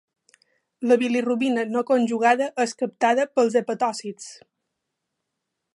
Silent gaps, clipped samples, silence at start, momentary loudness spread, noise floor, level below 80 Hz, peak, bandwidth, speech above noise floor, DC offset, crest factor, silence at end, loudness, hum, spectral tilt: none; under 0.1%; 0.8 s; 11 LU; -81 dBFS; -78 dBFS; -6 dBFS; 11 kHz; 59 dB; under 0.1%; 18 dB; 1.4 s; -22 LUFS; none; -4 dB/octave